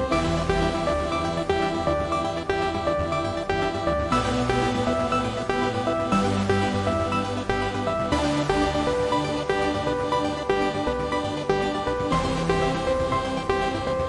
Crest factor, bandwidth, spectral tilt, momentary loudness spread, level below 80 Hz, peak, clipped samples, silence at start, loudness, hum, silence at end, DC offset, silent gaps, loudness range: 16 dB; 11.5 kHz; -5.5 dB/octave; 3 LU; -40 dBFS; -8 dBFS; under 0.1%; 0 s; -24 LUFS; none; 0 s; under 0.1%; none; 1 LU